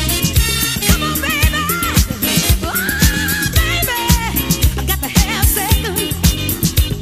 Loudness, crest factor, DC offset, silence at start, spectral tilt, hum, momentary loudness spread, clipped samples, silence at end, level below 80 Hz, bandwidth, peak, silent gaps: -15 LUFS; 16 dB; 0.4%; 0 s; -3.5 dB/octave; none; 2 LU; under 0.1%; 0 s; -20 dBFS; 16 kHz; 0 dBFS; none